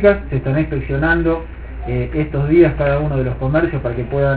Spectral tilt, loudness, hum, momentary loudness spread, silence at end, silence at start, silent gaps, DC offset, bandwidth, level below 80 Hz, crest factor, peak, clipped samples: -12 dB/octave; -17 LUFS; none; 10 LU; 0 s; 0 s; none; under 0.1%; 4 kHz; -28 dBFS; 16 dB; 0 dBFS; under 0.1%